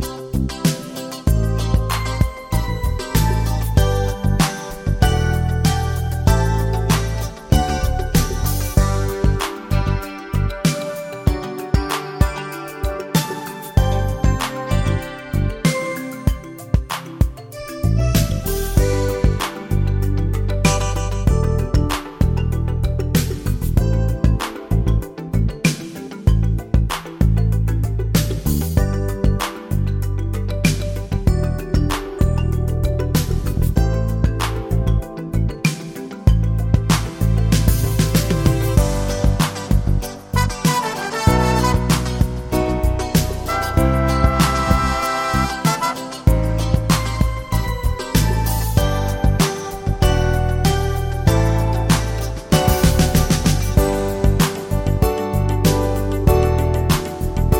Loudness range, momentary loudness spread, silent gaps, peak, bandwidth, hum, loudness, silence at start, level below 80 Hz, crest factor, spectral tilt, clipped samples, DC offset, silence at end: 4 LU; 6 LU; none; 0 dBFS; 17 kHz; none; -19 LUFS; 0 s; -22 dBFS; 18 dB; -5.5 dB/octave; under 0.1%; under 0.1%; 0 s